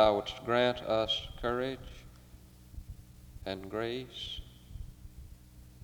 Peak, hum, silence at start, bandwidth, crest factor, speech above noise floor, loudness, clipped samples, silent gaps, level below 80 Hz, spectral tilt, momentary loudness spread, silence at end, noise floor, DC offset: -12 dBFS; none; 0 s; over 20 kHz; 24 dB; 22 dB; -34 LUFS; under 0.1%; none; -52 dBFS; -5 dB/octave; 24 LU; 0 s; -55 dBFS; under 0.1%